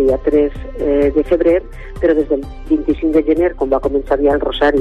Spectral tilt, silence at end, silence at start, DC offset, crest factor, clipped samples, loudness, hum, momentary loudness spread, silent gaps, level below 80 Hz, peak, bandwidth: -7.5 dB/octave; 0 s; 0 s; under 0.1%; 12 dB; under 0.1%; -15 LUFS; none; 6 LU; none; -28 dBFS; -4 dBFS; 8.8 kHz